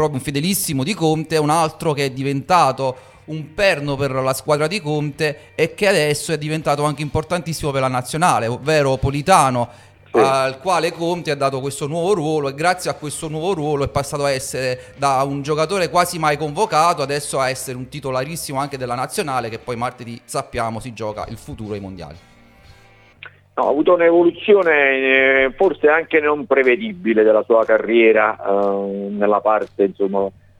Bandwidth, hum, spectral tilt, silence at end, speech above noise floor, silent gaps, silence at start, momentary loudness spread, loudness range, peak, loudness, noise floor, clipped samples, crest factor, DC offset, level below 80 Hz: 17 kHz; none; -5 dB/octave; 0.3 s; 30 dB; none; 0 s; 12 LU; 9 LU; 0 dBFS; -18 LUFS; -48 dBFS; under 0.1%; 18 dB; under 0.1%; -46 dBFS